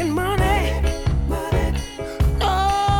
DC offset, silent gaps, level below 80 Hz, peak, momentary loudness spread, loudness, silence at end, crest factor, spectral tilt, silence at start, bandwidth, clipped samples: under 0.1%; none; -24 dBFS; -8 dBFS; 5 LU; -21 LUFS; 0 s; 12 dB; -5.5 dB/octave; 0 s; 17.5 kHz; under 0.1%